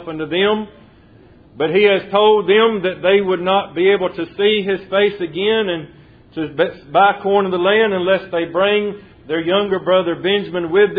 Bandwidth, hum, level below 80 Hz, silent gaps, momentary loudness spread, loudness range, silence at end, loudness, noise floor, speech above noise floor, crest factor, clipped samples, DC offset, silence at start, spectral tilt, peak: 4.9 kHz; none; -54 dBFS; none; 9 LU; 3 LU; 0 s; -16 LUFS; -46 dBFS; 30 dB; 16 dB; under 0.1%; under 0.1%; 0 s; -8.5 dB/octave; 0 dBFS